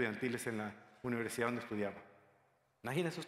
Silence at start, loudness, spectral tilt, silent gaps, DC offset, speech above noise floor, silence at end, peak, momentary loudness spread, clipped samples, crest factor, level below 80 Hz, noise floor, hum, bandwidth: 0 s; -40 LUFS; -5 dB/octave; none; under 0.1%; 34 dB; 0 s; -20 dBFS; 9 LU; under 0.1%; 20 dB; -76 dBFS; -74 dBFS; none; 16 kHz